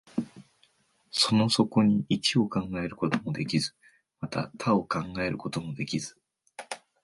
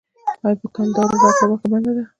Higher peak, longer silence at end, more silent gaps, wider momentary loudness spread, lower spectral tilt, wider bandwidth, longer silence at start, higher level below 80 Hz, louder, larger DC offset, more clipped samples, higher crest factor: second, -6 dBFS vs 0 dBFS; about the same, 0.25 s vs 0.15 s; neither; first, 17 LU vs 8 LU; about the same, -5 dB/octave vs -6 dB/octave; first, 11.5 kHz vs 9.2 kHz; about the same, 0.15 s vs 0.25 s; about the same, -60 dBFS vs -58 dBFS; second, -28 LUFS vs -17 LUFS; neither; neither; about the same, 22 dB vs 18 dB